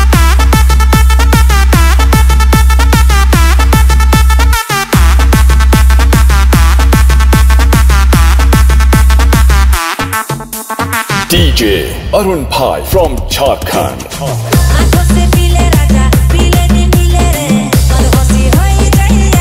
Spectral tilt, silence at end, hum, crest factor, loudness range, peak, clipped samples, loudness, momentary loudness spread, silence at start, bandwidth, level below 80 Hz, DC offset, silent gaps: -5 dB/octave; 0 s; none; 6 dB; 4 LU; 0 dBFS; 1%; -8 LUFS; 5 LU; 0 s; 16.5 kHz; -8 dBFS; under 0.1%; none